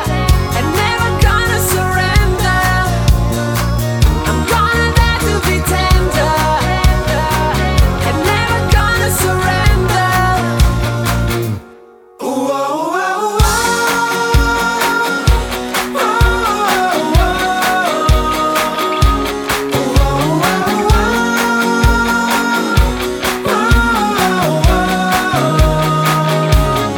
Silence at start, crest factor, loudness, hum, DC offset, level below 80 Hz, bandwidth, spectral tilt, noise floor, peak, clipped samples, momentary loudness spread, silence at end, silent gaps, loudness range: 0 s; 12 dB; -13 LUFS; none; under 0.1%; -18 dBFS; over 20 kHz; -4.5 dB/octave; -40 dBFS; 0 dBFS; under 0.1%; 4 LU; 0 s; none; 2 LU